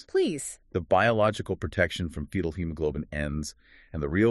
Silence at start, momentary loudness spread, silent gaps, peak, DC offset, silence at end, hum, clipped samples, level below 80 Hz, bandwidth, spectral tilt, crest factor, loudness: 0.15 s; 12 LU; none; -8 dBFS; under 0.1%; 0 s; none; under 0.1%; -44 dBFS; 13 kHz; -5.5 dB/octave; 20 dB; -28 LUFS